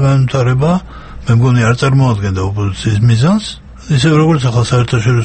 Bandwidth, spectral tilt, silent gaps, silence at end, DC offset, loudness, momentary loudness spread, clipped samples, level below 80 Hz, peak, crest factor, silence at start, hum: 8.8 kHz; -6.5 dB/octave; none; 0 s; under 0.1%; -12 LUFS; 7 LU; under 0.1%; -34 dBFS; 0 dBFS; 12 dB; 0 s; none